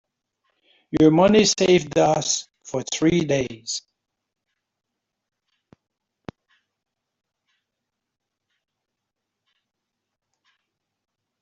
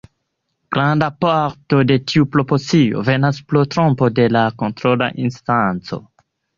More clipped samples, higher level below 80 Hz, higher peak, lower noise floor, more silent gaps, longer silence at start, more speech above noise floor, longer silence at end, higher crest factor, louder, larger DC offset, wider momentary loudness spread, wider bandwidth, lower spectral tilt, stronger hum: neither; second, -56 dBFS vs -50 dBFS; second, -4 dBFS vs 0 dBFS; first, -82 dBFS vs -72 dBFS; neither; first, 0.9 s vs 0.7 s; first, 64 dB vs 57 dB; first, 7.65 s vs 0.6 s; about the same, 20 dB vs 16 dB; second, -20 LUFS vs -17 LUFS; neither; first, 14 LU vs 6 LU; first, 8.2 kHz vs 7.4 kHz; second, -4.5 dB/octave vs -7 dB/octave; neither